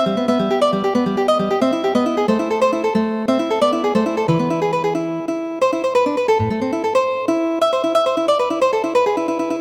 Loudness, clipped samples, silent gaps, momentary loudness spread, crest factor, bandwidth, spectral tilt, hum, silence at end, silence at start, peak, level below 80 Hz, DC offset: -18 LUFS; under 0.1%; none; 3 LU; 14 dB; 17 kHz; -6 dB/octave; none; 0 s; 0 s; -4 dBFS; -54 dBFS; under 0.1%